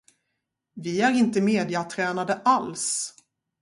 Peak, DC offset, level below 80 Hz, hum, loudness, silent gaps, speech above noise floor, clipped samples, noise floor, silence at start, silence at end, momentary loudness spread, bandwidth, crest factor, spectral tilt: -8 dBFS; under 0.1%; -70 dBFS; none; -24 LUFS; none; 56 dB; under 0.1%; -80 dBFS; 0.75 s; 0.5 s; 8 LU; 11.5 kHz; 18 dB; -4 dB/octave